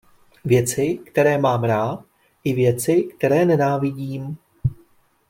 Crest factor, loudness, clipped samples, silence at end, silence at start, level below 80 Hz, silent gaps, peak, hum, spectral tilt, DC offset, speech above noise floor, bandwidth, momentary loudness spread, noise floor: 16 dB; -20 LUFS; under 0.1%; 0.55 s; 0.45 s; -50 dBFS; none; -4 dBFS; none; -6.5 dB/octave; under 0.1%; 38 dB; 16.5 kHz; 12 LU; -57 dBFS